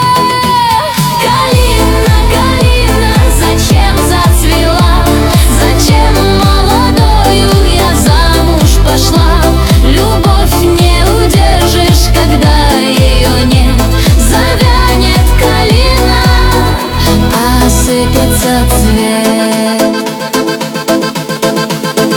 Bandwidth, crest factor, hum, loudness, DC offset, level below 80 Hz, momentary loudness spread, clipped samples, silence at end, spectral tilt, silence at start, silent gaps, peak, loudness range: 18 kHz; 6 dB; none; -8 LUFS; under 0.1%; -12 dBFS; 3 LU; 0.3%; 0 s; -5 dB/octave; 0 s; none; 0 dBFS; 2 LU